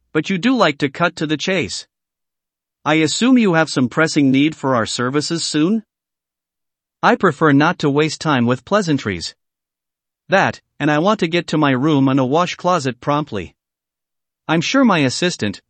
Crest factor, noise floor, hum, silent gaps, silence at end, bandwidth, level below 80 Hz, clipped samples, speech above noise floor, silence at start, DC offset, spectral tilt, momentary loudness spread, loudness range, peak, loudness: 18 dB; -85 dBFS; none; none; 0.1 s; 8.8 kHz; -58 dBFS; under 0.1%; 69 dB; 0.15 s; under 0.1%; -5 dB/octave; 7 LU; 3 LU; 0 dBFS; -17 LUFS